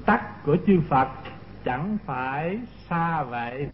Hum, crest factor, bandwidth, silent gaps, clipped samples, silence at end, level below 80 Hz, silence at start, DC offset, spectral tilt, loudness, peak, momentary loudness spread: none; 18 dB; 5.8 kHz; none; under 0.1%; 0 s; -48 dBFS; 0 s; 0.2%; -12 dB/octave; -26 LUFS; -6 dBFS; 12 LU